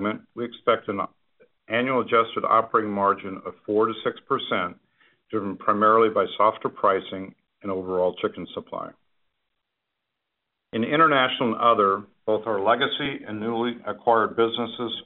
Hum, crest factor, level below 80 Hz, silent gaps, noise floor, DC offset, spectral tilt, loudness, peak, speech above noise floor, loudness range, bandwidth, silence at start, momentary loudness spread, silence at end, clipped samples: none; 18 dB; -68 dBFS; none; -82 dBFS; under 0.1%; -2.5 dB/octave; -23 LUFS; -6 dBFS; 58 dB; 6 LU; 4.2 kHz; 0 s; 15 LU; 0.05 s; under 0.1%